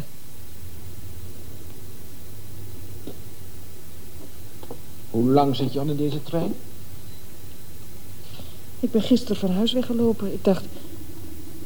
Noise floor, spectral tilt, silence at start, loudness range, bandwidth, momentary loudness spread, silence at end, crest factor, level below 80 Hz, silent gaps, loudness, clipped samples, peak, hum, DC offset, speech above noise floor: -44 dBFS; -6.5 dB/octave; 0 s; 16 LU; over 20 kHz; 21 LU; 0 s; 22 dB; -50 dBFS; none; -23 LUFS; under 0.1%; -6 dBFS; none; 5%; 22 dB